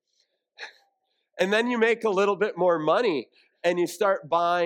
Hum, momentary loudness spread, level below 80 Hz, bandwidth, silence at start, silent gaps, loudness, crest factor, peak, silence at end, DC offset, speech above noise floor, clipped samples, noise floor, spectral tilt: none; 16 LU; -80 dBFS; 17 kHz; 0.6 s; none; -24 LUFS; 16 dB; -8 dBFS; 0 s; under 0.1%; 51 dB; under 0.1%; -74 dBFS; -4.5 dB/octave